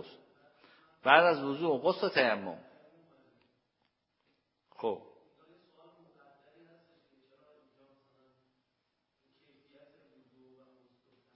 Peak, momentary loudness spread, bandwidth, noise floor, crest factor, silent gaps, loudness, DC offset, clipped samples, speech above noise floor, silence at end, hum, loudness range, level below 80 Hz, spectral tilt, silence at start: -6 dBFS; 21 LU; 5.6 kHz; -82 dBFS; 30 dB; none; -29 LUFS; under 0.1%; under 0.1%; 53 dB; 6.35 s; none; 16 LU; -84 dBFS; -1.5 dB/octave; 0 s